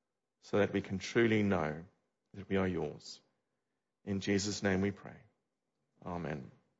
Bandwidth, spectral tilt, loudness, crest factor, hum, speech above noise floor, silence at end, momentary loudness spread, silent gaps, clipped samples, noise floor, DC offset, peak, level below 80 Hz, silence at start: 7.6 kHz; -5.5 dB/octave; -35 LUFS; 20 dB; none; 53 dB; 0.3 s; 20 LU; none; under 0.1%; -88 dBFS; under 0.1%; -18 dBFS; -66 dBFS; 0.45 s